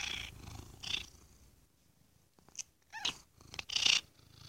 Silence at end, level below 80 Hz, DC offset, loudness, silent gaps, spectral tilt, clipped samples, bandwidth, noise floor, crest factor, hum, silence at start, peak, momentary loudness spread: 0 s; -62 dBFS; under 0.1%; -35 LUFS; none; 0.5 dB/octave; under 0.1%; 16.5 kHz; -70 dBFS; 28 dB; none; 0 s; -12 dBFS; 22 LU